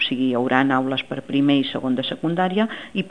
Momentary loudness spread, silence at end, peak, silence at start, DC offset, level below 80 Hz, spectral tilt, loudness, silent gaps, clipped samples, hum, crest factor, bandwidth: 6 LU; 0 s; 0 dBFS; 0 s; 0.4%; -64 dBFS; -7 dB/octave; -21 LUFS; none; under 0.1%; none; 20 dB; 9.6 kHz